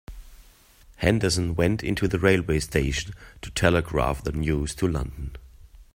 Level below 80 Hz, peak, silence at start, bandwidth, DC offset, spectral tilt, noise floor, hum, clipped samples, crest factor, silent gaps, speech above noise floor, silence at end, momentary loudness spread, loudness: -38 dBFS; -2 dBFS; 0.1 s; 16.5 kHz; under 0.1%; -5.5 dB/octave; -53 dBFS; none; under 0.1%; 22 dB; none; 29 dB; 0.1 s; 12 LU; -25 LUFS